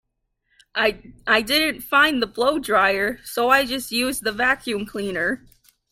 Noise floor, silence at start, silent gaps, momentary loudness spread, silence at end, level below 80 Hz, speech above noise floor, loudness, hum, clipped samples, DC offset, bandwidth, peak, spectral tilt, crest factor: -72 dBFS; 0.75 s; none; 9 LU; 0.55 s; -52 dBFS; 51 dB; -20 LUFS; none; under 0.1%; under 0.1%; 16.5 kHz; -2 dBFS; -2.5 dB/octave; 20 dB